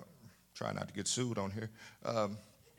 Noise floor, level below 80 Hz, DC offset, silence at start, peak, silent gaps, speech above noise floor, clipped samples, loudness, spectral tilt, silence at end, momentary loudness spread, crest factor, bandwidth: -61 dBFS; -76 dBFS; under 0.1%; 0 s; -20 dBFS; none; 22 dB; under 0.1%; -39 LUFS; -4 dB/octave; 0.3 s; 15 LU; 20 dB; 18 kHz